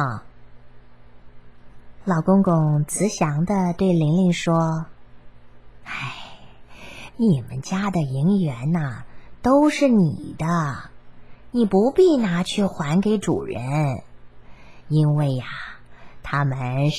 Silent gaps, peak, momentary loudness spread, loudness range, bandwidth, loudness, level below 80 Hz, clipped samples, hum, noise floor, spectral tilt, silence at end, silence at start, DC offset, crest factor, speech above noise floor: none; -6 dBFS; 16 LU; 5 LU; 12.5 kHz; -21 LUFS; -50 dBFS; under 0.1%; none; -46 dBFS; -7 dB/octave; 0 s; 0 s; 0.7%; 16 dB; 26 dB